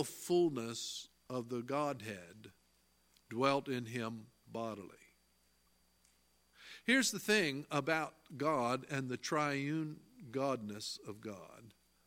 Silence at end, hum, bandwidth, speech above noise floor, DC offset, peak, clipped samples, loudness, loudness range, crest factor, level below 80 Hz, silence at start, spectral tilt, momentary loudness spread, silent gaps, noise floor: 0.35 s; 60 Hz at -70 dBFS; 16.5 kHz; 36 dB; under 0.1%; -14 dBFS; under 0.1%; -37 LUFS; 6 LU; 24 dB; -78 dBFS; 0 s; -4 dB/octave; 17 LU; none; -74 dBFS